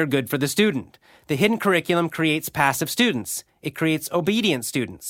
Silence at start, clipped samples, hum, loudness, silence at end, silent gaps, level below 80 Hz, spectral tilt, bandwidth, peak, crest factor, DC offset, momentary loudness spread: 0 s; under 0.1%; none; -22 LUFS; 0 s; none; -60 dBFS; -4 dB/octave; 17 kHz; -4 dBFS; 20 dB; under 0.1%; 8 LU